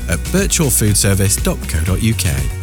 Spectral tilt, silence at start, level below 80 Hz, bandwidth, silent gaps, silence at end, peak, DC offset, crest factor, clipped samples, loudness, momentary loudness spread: -4 dB/octave; 0 s; -22 dBFS; over 20 kHz; none; 0 s; -4 dBFS; under 0.1%; 12 dB; under 0.1%; -15 LUFS; 6 LU